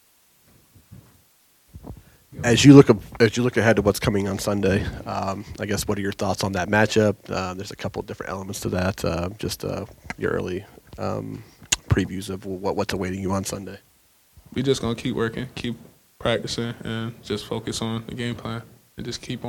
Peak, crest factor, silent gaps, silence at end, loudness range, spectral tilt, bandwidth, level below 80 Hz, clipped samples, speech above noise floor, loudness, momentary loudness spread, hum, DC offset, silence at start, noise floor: 0 dBFS; 24 dB; none; 0 s; 10 LU; -5.5 dB/octave; 17.5 kHz; -46 dBFS; under 0.1%; 37 dB; -23 LUFS; 14 LU; none; under 0.1%; 0.9 s; -59 dBFS